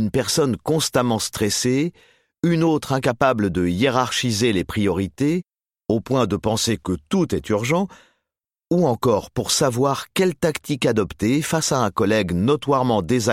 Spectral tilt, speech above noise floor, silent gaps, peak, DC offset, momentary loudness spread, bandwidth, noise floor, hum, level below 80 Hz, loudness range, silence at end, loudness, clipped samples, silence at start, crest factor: -5 dB/octave; 65 dB; none; -4 dBFS; under 0.1%; 4 LU; 16.5 kHz; -85 dBFS; none; -48 dBFS; 2 LU; 0 s; -21 LUFS; under 0.1%; 0 s; 16 dB